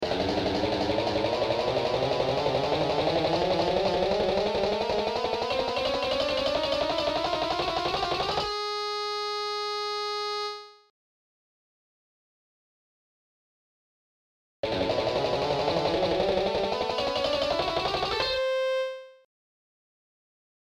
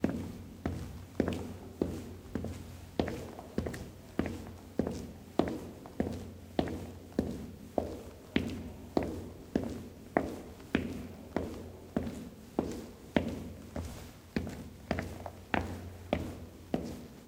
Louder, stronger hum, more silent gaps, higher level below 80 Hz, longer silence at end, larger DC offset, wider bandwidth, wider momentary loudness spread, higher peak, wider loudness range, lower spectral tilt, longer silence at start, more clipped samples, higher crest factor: first, -27 LUFS vs -39 LUFS; neither; first, 10.90-14.63 s vs none; about the same, -50 dBFS vs -54 dBFS; first, 1.7 s vs 0 s; neither; second, 15.5 kHz vs 17.5 kHz; second, 4 LU vs 10 LU; second, -14 dBFS vs -6 dBFS; first, 8 LU vs 2 LU; second, -4.5 dB/octave vs -6.5 dB/octave; about the same, 0 s vs 0 s; neither; second, 16 dB vs 30 dB